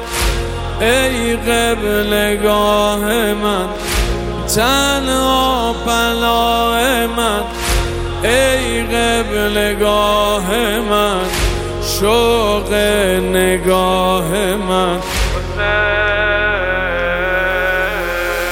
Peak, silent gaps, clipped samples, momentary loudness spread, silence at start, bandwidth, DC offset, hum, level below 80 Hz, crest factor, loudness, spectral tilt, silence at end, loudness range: 0 dBFS; none; under 0.1%; 5 LU; 0 s; 17 kHz; under 0.1%; none; -26 dBFS; 14 dB; -15 LUFS; -3.5 dB/octave; 0 s; 1 LU